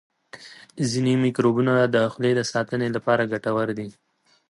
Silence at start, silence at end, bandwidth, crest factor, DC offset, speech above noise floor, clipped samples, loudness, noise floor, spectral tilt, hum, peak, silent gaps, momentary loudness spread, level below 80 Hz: 0.35 s; 0.6 s; 11.5 kHz; 18 dB; under 0.1%; 24 dB; under 0.1%; -22 LUFS; -45 dBFS; -6 dB/octave; none; -6 dBFS; none; 20 LU; -64 dBFS